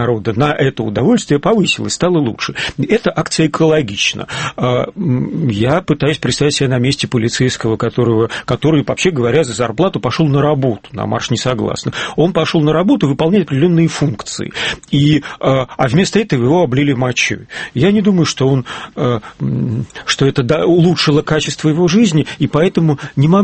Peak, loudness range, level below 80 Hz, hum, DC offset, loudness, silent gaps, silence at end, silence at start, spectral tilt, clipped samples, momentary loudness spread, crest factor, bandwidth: 0 dBFS; 2 LU; -42 dBFS; none; under 0.1%; -14 LUFS; none; 0 s; 0 s; -5.5 dB/octave; under 0.1%; 7 LU; 14 dB; 8.8 kHz